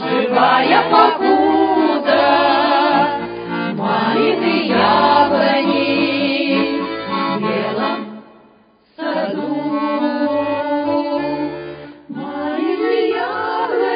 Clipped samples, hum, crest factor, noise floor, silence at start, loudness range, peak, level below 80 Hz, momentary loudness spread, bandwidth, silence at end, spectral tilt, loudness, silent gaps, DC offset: under 0.1%; none; 16 dB; -52 dBFS; 0 s; 7 LU; 0 dBFS; -56 dBFS; 11 LU; 5.2 kHz; 0 s; -9 dB/octave; -16 LUFS; none; under 0.1%